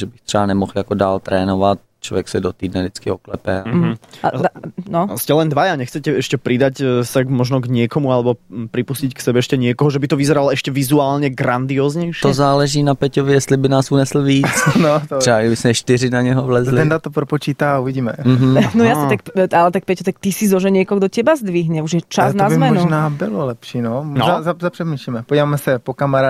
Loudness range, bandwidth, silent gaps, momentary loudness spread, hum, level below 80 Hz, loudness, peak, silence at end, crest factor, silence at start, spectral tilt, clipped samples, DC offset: 4 LU; 15.5 kHz; none; 8 LU; none; -48 dBFS; -16 LUFS; -2 dBFS; 0 s; 14 dB; 0 s; -6 dB/octave; under 0.1%; under 0.1%